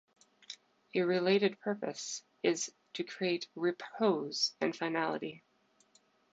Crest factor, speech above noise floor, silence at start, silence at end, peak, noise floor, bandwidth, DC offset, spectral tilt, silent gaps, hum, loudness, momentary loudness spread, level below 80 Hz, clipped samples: 20 dB; 36 dB; 0.5 s; 0.95 s; -16 dBFS; -70 dBFS; 9 kHz; under 0.1%; -4 dB/octave; none; none; -34 LUFS; 12 LU; -86 dBFS; under 0.1%